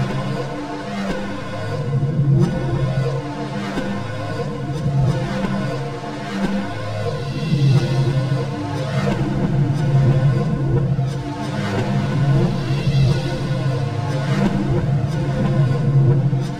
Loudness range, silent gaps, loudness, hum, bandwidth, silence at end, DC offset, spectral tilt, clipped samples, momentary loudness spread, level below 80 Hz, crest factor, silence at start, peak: 4 LU; none; -20 LUFS; none; 9.8 kHz; 0 s; 1%; -7.5 dB/octave; under 0.1%; 9 LU; -38 dBFS; 14 dB; 0 s; -6 dBFS